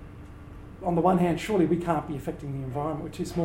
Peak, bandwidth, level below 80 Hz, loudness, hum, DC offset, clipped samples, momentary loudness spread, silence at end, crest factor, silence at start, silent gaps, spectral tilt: -8 dBFS; 16.5 kHz; -48 dBFS; -27 LUFS; none; under 0.1%; under 0.1%; 22 LU; 0 s; 18 dB; 0 s; none; -7.5 dB/octave